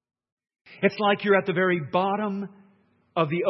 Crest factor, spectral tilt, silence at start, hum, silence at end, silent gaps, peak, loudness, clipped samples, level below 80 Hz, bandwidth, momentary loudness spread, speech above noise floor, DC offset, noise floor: 20 dB; -8.5 dB/octave; 0.7 s; none; 0 s; none; -6 dBFS; -24 LUFS; under 0.1%; -74 dBFS; 6 kHz; 11 LU; 39 dB; under 0.1%; -63 dBFS